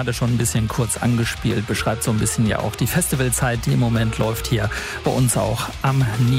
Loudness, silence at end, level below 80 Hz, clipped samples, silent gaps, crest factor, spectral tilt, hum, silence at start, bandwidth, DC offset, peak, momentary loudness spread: -20 LUFS; 0 s; -36 dBFS; under 0.1%; none; 16 dB; -5 dB/octave; none; 0 s; 16 kHz; under 0.1%; -4 dBFS; 4 LU